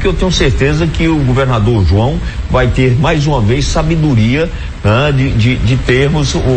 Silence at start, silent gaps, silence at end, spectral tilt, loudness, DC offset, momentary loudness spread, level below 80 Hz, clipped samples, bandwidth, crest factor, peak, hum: 0 s; none; 0 s; -6 dB/octave; -12 LUFS; under 0.1%; 3 LU; -20 dBFS; under 0.1%; 8.8 kHz; 10 dB; 0 dBFS; none